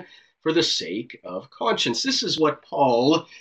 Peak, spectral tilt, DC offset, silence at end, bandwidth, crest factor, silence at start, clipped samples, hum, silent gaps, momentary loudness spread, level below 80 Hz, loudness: -6 dBFS; -3.5 dB/octave; under 0.1%; 0 s; 8.6 kHz; 16 dB; 0 s; under 0.1%; none; none; 13 LU; -68 dBFS; -22 LUFS